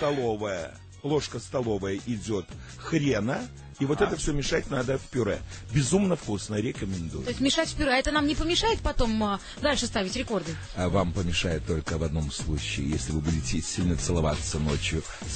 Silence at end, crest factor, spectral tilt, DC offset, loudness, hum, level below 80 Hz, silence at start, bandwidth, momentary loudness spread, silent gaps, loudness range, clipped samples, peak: 0 s; 18 dB; -4.5 dB/octave; under 0.1%; -28 LUFS; none; -38 dBFS; 0 s; 9.2 kHz; 8 LU; none; 3 LU; under 0.1%; -10 dBFS